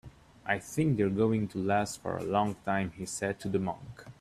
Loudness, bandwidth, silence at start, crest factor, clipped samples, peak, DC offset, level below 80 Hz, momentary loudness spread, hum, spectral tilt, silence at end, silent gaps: -31 LUFS; 14.5 kHz; 0.05 s; 18 dB; under 0.1%; -12 dBFS; under 0.1%; -60 dBFS; 8 LU; none; -6 dB/octave; 0.1 s; none